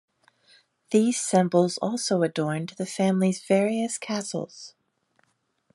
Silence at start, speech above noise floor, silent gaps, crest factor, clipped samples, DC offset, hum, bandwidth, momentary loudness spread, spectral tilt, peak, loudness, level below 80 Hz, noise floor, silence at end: 0.9 s; 47 dB; none; 20 dB; under 0.1%; under 0.1%; none; 12 kHz; 10 LU; -5 dB/octave; -8 dBFS; -25 LUFS; -76 dBFS; -71 dBFS; 1.05 s